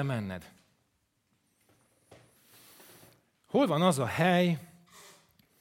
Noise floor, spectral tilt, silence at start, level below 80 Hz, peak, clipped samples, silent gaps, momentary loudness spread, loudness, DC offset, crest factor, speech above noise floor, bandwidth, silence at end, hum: -76 dBFS; -6 dB/octave; 0 s; -74 dBFS; -10 dBFS; under 0.1%; none; 13 LU; -28 LUFS; under 0.1%; 22 dB; 48 dB; 16.5 kHz; 0.95 s; none